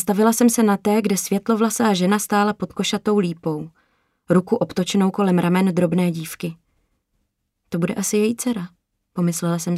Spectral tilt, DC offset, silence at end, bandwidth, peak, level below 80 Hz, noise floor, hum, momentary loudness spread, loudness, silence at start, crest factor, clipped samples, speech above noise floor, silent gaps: -5.5 dB/octave; under 0.1%; 0 s; 16 kHz; -4 dBFS; -60 dBFS; -73 dBFS; none; 11 LU; -20 LUFS; 0 s; 16 dB; under 0.1%; 53 dB; none